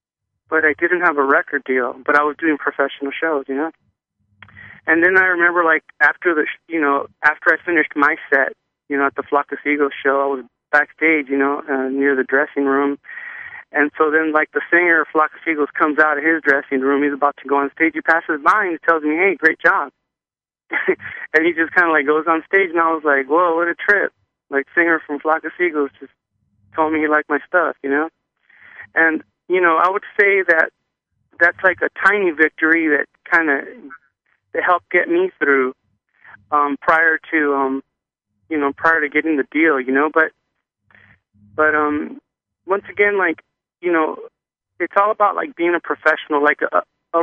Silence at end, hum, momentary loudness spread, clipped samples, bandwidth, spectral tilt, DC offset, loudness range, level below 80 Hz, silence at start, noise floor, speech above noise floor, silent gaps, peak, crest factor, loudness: 0 s; none; 8 LU; under 0.1%; 7.6 kHz; -6 dB/octave; under 0.1%; 4 LU; -66 dBFS; 0.5 s; under -90 dBFS; over 73 dB; none; 0 dBFS; 18 dB; -17 LUFS